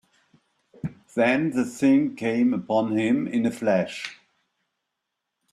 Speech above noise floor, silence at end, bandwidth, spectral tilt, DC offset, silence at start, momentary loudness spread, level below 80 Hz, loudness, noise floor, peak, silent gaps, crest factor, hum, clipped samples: 59 dB; 1.4 s; 12.5 kHz; -6.5 dB/octave; under 0.1%; 0.85 s; 15 LU; -66 dBFS; -23 LUFS; -82 dBFS; -6 dBFS; none; 18 dB; none; under 0.1%